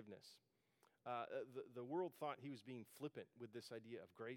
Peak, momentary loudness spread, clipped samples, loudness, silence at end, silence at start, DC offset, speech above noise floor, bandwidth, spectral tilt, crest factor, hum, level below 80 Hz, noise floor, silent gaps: -34 dBFS; 11 LU; under 0.1%; -52 LUFS; 0 s; 0 s; under 0.1%; 29 dB; 18 kHz; -6 dB/octave; 18 dB; none; under -90 dBFS; -81 dBFS; none